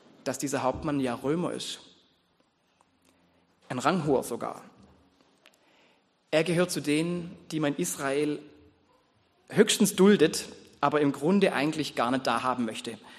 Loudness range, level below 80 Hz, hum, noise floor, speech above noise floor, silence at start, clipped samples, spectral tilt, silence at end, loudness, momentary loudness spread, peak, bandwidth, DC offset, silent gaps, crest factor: 8 LU; -62 dBFS; none; -69 dBFS; 42 dB; 0.25 s; under 0.1%; -4.5 dB/octave; 0 s; -27 LUFS; 14 LU; -6 dBFS; 13 kHz; under 0.1%; none; 22 dB